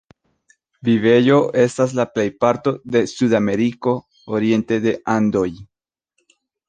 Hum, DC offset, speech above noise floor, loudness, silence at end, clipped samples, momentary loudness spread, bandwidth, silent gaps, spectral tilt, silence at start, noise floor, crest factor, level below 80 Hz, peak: none; under 0.1%; 55 dB; -18 LUFS; 1.05 s; under 0.1%; 8 LU; 9.4 kHz; none; -6.5 dB/octave; 0.85 s; -72 dBFS; 16 dB; -56 dBFS; -2 dBFS